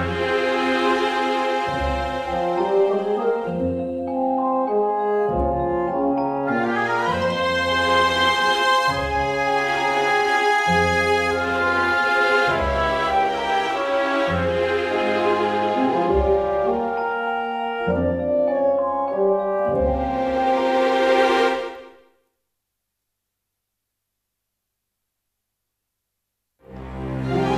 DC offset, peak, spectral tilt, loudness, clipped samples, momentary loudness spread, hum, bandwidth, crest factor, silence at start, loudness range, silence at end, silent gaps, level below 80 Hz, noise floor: under 0.1%; -6 dBFS; -5 dB/octave; -20 LUFS; under 0.1%; 6 LU; 50 Hz at -65 dBFS; 14.5 kHz; 16 dB; 0 s; 3 LU; 0 s; none; -40 dBFS; -80 dBFS